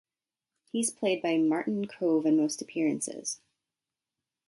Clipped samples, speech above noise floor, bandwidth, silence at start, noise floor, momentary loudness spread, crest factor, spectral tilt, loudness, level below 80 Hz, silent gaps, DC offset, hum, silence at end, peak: under 0.1%; over 62 dB; 12 kHz; 0.75 s; under -90 dBFS; 11 LU; 14 dB; -4 dB/octave; -29 LUFS; -80 dBFS; none; under 0.1%; none; 1.15 s; -16 dBFS